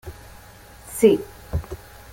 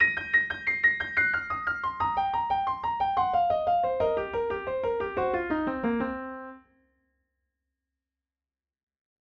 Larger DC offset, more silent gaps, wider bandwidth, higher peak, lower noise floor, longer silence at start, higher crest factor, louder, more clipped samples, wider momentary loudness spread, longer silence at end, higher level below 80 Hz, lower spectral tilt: neither; neither; first, 17 kHz vs 7 kHz; first, -2 dBFS vs -12 dBFS; second, -45 dBFS vs under -90 dBFS; about the same, 0.05 s vs 0 s; first, 22 dB vs 16 dB; first, -21 LUFS vs -27 LUFS; neither; first, 25 LU vs 7 LU; second, 0.35 s vs 2.65 s; first, -42 dBFS vs -54 dBFS; about the same, -6 dB/octave vs -6.5 dB/octave